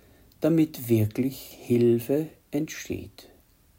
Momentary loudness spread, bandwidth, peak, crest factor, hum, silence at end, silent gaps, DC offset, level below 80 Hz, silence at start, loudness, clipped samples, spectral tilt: 14 LU; 16.5 kHz; -12 dBFS; 16 dB; none; 0.55 s; none; under 0.1%; -60 dBFS; 0.4 s; -26 LUFS; under 0.1%; -7 dB/octave